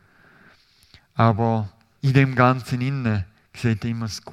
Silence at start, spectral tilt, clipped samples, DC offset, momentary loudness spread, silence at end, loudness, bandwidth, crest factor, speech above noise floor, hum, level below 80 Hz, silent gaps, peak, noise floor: 1.15 s; -7 dB/octave; under 0.1%; under 0.1%; 11 LU; 0 s; -22 LUFS; 12.5 kHz; 22 dB; 35 dB; none; -56 dBFS; none; 0 dBFS; -55 dBFS